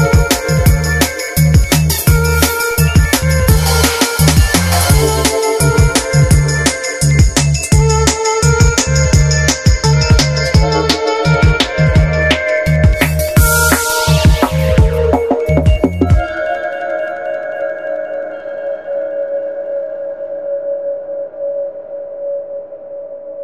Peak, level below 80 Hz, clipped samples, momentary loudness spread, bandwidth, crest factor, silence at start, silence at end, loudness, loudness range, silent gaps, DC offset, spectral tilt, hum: 0 dBFS; -18 dBFS; under 0.1%; 12 LU; 15 kHz; 12 dB; 0 s; 0 s; -13 LUFS; 10 LU; none; under 0.1%; -4.5 dB/octave; none